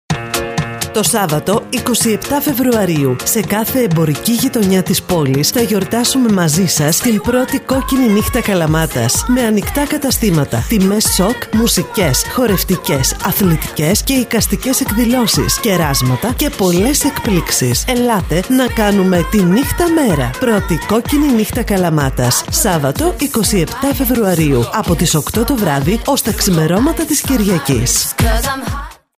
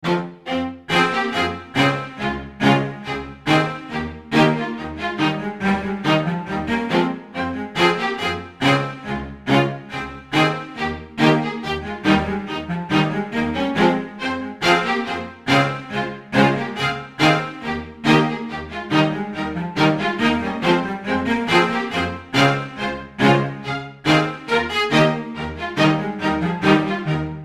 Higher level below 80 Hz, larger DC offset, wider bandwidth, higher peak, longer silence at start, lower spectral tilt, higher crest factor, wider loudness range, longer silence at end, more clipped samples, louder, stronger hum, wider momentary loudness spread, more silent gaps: first, -28 dBFS vs -46 dBFS; neither; first, 16 kHz vs 14.5 kHz; about the same, 0 dBFS vs -2 dBFS; about the same, 0.1 s vs 0 s; about the same, -4.5 dB/octave vs -5.5 dB/octave; second, 12 dB vs 20 dB; about the same, 1 LU vs 2 LU; first, 0.25 s vs 0 s; neither; first, -13 LUFS vs -20 LUFS; neither; second, 3 LU vs 9 LU; neither